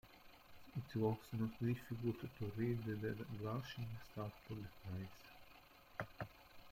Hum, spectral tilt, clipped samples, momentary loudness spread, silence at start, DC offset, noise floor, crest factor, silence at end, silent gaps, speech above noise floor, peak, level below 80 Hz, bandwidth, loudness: none; -8 dB/octave; under 0.1%; 21 LU; 0.05 s; under 0.1%; -64 dBFS; 18 dB; 0 s; none; 20 dB; -26 dBFS; -68 dBFS; 16.5 kHz; -46 LUFS